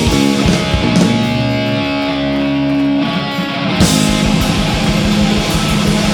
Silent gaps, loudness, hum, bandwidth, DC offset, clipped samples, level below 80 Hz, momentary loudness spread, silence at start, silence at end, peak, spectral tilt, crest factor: none; -13 LUFS; none; 19 kHz; under 0.1%; under 0.1%; -26 dBFS; 4 LU; 0 s; 0 s; 0 dBFS; -5 dB/octave; 14 dB